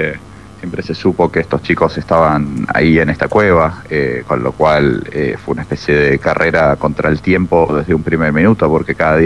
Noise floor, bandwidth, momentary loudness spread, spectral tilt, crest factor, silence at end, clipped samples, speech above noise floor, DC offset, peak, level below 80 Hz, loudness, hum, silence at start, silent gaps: -33 dBFS; 11.5 kHz; 7 LU; -8 dB/octave; 14 dB; 0 s; under 0.1%; 20 dB; 0.5%; 0 dBFS; -36 dBFS; -13 LUFS; none; 0 s; none